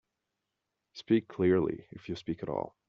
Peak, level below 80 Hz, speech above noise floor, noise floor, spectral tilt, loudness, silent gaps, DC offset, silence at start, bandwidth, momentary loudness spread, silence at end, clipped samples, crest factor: -14 dBFS; -66 dBFS; 55 dB; -86 dBFS; -6.5 dB/octave; -31 LUFS; none; under 0.1%; 0.95 s; 7 kHz; 17 LU; 0.2 s; under 0.1%; 18 dB